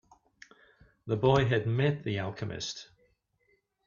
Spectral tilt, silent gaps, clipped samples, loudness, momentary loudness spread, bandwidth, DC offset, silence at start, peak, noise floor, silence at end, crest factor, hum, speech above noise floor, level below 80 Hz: -6 dB/octave; none; under 0.1%; -30 LUFS; 13 LU; 7.2 kHz; under 0.1%; 1.05 s; -10 dBFS; -73 dBFS; 1 s; 22 dB; none; 44 dB; -58 dBFS